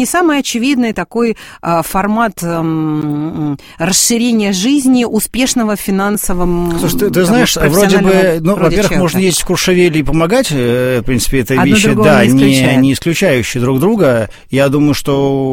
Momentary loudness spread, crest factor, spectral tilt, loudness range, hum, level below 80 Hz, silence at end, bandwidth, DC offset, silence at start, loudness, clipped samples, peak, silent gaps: 7 LU; 12 dB; -4.5 dB/octave; 4 LU; none; -30 dBFS; 0 s; 17 kHz; 0.5%; 0 s; -12 LUFS; 0.1%; 0 dBFS; none